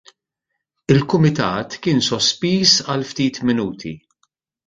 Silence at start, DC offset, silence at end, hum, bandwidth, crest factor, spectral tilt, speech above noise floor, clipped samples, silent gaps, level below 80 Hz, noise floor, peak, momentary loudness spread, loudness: 0.9 s; under 0.1%; 0.7 s; none; 9.4 kHz; 18 dB; -4.5 dB/octave; 61 dB; under 0.1%; none; -50 dBFS; -78 dBFS; 0 dBFS; 12 LU; -17 LUFS